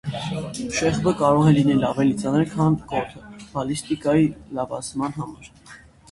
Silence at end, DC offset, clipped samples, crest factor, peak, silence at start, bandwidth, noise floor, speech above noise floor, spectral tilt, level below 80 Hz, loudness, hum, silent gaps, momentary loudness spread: 0.35 s; under 0.1%; under 0.1%; 18 dB; -4 dBFS; 0.05 s; 11.5 kHz; -47 dBFS; 26 dB; -6.5 dB/octave; -48 dBFS; -22 LUFS; none; none; 13 LU